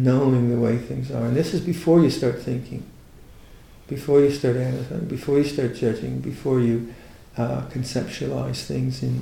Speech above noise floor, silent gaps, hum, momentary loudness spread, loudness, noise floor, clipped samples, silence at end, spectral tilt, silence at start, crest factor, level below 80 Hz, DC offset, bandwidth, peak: 24 dB; none; none; 11 LU; -23 LUFS; -46 dBFS; under 0.1%; 0 s; -7.5 dB/octave; 0 s; 16 dB; -48 dBFS; under 0.1%; 15.5 kHz; -6 dBFS